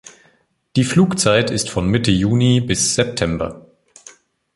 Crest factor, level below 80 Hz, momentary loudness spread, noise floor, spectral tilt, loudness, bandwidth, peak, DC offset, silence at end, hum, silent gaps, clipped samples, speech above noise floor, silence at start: 18 dB; -40 dBFS; 7 LU; -59 dBFS; -4.5 dB/octave; -17 LUFS; 11.5 kHz; 0 dBFS; under 0.1%; 0.95 s; none; none; under 0.1%; 42 dB; 0.05 s